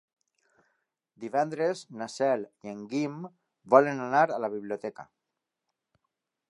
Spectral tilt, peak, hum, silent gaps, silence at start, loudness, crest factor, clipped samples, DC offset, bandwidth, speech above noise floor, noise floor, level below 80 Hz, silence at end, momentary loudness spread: -6 dB/octave; -4 dBFS; none; none; 1.2 s; -28 LUFS; 26 dB; under 0.1%; under 0.1%; 11 kHz; 58 dB; -86 dBFS; -82 dBFS; 1.45 s; 19 LU